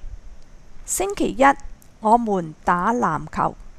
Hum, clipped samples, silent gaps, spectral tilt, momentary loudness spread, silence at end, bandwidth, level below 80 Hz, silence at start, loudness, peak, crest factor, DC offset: none; under 0.1%; none; -4.5 dB/octave; 9 LU; 0 s; 15.5 kHz; -40 dBFS; 0 s; -21 LUFS; -2 dBFS; 20 dB; under 0.1%